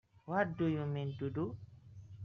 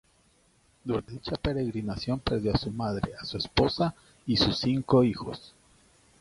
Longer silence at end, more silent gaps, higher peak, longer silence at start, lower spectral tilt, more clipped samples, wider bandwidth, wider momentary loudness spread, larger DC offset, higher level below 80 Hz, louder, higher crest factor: second, 0 s vs 0.7 s; neither; second, -18 dBFS vs -10 dBFS; second, 0.25 s vs 0.85 s; about the same, -7 dB/octave vs -6.5 dB/octave; neither; second, 6.4 kHz vs 11.5 kHz; first, 21 LU vs 12 LU; neither; second, -68 dBFS vs -46 dBFS; second, -38 LUFS vs -28 LUFS; about the same, 20 dB vs 20 dB